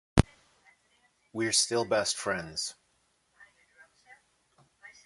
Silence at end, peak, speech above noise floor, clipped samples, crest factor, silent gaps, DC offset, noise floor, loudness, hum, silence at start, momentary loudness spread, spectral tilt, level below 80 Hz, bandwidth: 0.15 s; -4 dBFS; 42 dB; under 0.1%; 30 dB; none; under 0.1%; -72 dBFS; -29 LUFS; none; 0.15 s; 12 LU; -3.5 dB/octave; -46 dBFS; 12 kHz